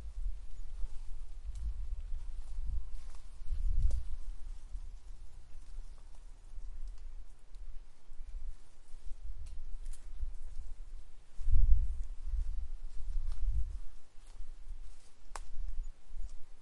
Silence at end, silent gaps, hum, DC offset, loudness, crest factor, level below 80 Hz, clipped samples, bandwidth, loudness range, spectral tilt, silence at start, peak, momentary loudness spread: 0 s; none; none; under 0.1%; -44 LUFS; 22 dB; -38 dBFS; under 0.1%; 7.8 kHz; 14 LU; -5.5 dB/octave; 0 s; -10 dBFS; 20 LU